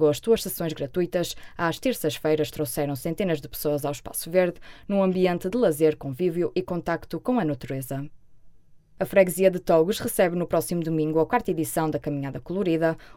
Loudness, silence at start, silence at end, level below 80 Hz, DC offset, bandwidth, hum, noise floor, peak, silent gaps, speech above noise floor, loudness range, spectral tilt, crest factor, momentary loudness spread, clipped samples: -25 LUFS; 0 s; 0.05 s; -52 dBFS; under 0.1%; 17.5 kHz; none; -50 dBFS; -6 dBFS; none; 26 dB; 4 LU; -5.5 dB/octave; 20 dB; 9 LU; under 0.1%